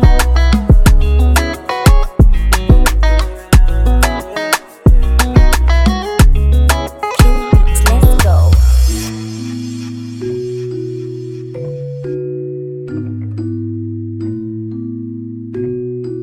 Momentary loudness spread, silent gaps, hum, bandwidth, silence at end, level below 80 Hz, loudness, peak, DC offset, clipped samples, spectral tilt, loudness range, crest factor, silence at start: 13 LU; none; none; 16 kHz; 0 s; -12 dBFS; -14 LUFS; 0 dBFS; under 0.1%; under 0.1%; -5.5 dB/octave; 11 LU; 10 dB; 0 s